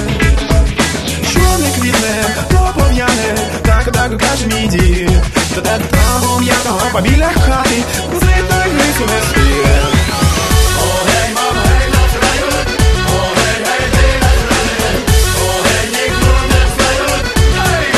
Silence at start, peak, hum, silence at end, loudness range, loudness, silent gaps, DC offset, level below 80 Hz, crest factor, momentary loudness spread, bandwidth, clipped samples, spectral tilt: 0 s; 0 dBFS; none; 0 s; 1 LU; -12 LUFS; none; under 0.1%; -16 dBFS; 12 dB; 3 LU; 13.5 kHz; under 0.1%; -4 dB/octave